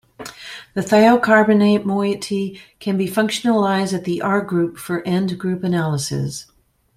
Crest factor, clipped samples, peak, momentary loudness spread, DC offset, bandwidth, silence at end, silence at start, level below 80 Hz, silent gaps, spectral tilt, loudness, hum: 18 dB; under 0.1%; -2 dBFS; 16 LU; under 0.1%; 15.5 kHz; 0.55 s; 0.2 s; -56 dBFS; none; -5.5 dB/octave; -18 LUFS; none